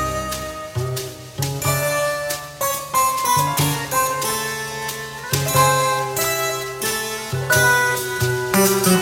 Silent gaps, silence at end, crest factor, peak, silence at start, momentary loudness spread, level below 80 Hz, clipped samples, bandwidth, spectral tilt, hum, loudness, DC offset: none; 0 s; 18 dB; -2 dBFS; 0 s; 11 LU; -46 dBFS; under 0.1%; 17 kHz; -3.5 dB/octave; none; -20 LUFS; under 0.1%